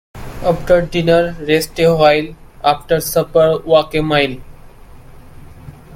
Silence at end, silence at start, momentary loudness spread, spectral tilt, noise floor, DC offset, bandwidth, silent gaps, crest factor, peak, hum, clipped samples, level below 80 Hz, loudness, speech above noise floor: 0 s; 0.15 s; 8 LU; -5 dB/octave; -37 dBFS; under 0.1%; 16.5 kHz; none; 16 dB; 0 dBFS; none; under 0.1%; -36 dBFS; -14 LUFS; 24 dB